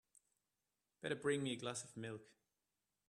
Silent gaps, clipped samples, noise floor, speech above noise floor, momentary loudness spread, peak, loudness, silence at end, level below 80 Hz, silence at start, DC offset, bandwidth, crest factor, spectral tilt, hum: none; under 0.1%; under -90 dBFS; over 46 dB; 11 LU; -26 dBFS; -44 LUFS; 0.85 s; -86 dBFS; 1.05 s; under 0.1%; 13 kHz; 22 dB; -4 dB/octave; 50 Hz at -85 dBFS